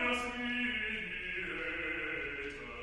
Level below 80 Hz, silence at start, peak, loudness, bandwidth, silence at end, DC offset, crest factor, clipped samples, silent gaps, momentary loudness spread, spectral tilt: -56 dBFS; 0 s; -22 dBFS; -36 LUFS; 13 kHz; 0 s; under 0.1%; 16 dB; under 0.1%; none; 5 LU; -3.5 dB/octave